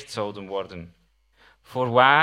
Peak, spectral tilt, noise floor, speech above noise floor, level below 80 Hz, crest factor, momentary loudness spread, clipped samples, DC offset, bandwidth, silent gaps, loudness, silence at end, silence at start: -2 dBFS; -5 dB/octave; -59 dBFS; 37 dB; -64 dBFS; 22 dB; 20 LU; under 0.1%; under 0.1%; 13 kHz; none; -24 LUFS; 0 s; 0 s